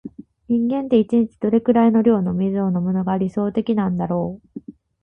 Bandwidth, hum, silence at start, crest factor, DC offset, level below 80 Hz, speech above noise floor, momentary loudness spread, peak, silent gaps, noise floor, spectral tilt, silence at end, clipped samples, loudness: 3.7 kHz; none; 0.05 s; 16 dB; under 0.1%; -52 dBFS; 20 dB; 12 LU; -4 dBFS; none; -38 dBFS; -10 dB/octave; 0.3 s; under 0.1%; -19 LUFS